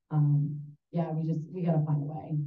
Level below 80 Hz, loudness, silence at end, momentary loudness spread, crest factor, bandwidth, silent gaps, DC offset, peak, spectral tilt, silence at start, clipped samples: -72 dBFS; -30 LUFS; 0 s; 8 LU; 14 dB; 3.1 kHz; none; under 0.1%; -16 dBFS; -12 dB/octave; 0.1 s; under 0.1%